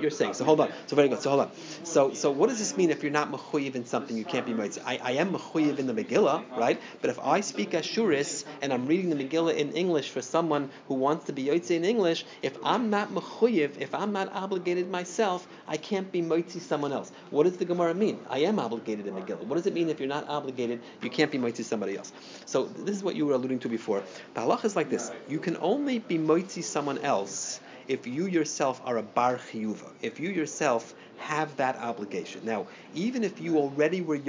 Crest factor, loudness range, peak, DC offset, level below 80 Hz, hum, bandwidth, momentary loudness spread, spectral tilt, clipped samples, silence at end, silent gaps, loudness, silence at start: 20 dB; 3 LU; -8 dBFS; under 0.1%; -82 dBFS; none; 7.6 kHz; 8 LU; -4.5 dB/octave; under 0.1%; 0 s; none; -29 LUFS; 0 s